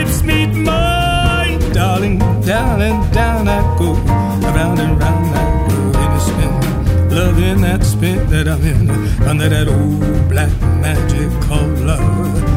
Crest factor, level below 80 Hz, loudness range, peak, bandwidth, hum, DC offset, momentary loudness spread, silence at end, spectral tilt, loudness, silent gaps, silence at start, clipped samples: 12 dB; -18 dBFS; 1 LU; 0 dBFS; 16.5 kHz; none; under 0.1%; 2 LU; 0 s; -6 dB/octave; -14 LUFS; none; 0 s; under 0.1%